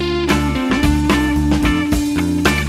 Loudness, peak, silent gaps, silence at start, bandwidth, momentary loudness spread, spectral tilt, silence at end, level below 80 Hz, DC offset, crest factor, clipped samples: -16 LUFS; 0 dBFS; none; 0 s; 15.5 kHz; 2 LU; -5.5 dB/octave; 0 s; -24 dBFS; under 0.1%; 14 dB; under 0.1%